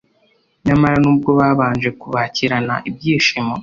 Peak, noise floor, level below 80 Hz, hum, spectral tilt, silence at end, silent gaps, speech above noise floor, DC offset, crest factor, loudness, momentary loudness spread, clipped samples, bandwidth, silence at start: -2 dBFS; -59 dBFS; -44 dBFS; none; -6 dB/octave; 0 s; none; 43 dB; under 0.1%; 14 dB; -16 LUFS; 8 LU; under 0.1%; 7.4 kHz; 0.65 s